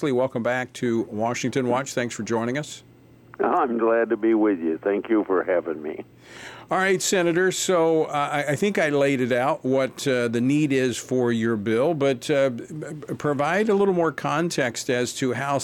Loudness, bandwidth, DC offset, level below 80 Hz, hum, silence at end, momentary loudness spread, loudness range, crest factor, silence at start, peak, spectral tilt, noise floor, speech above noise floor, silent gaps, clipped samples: -23 LUFS; 17 kHz; under 0.1%; -66 dBFS; none; 0 s; 8 LU; 3 LU; 14 dB; 0 s; -8 dBFS; -5 dB/octave; -49 dBFS; 26 dB; none; under 0.1%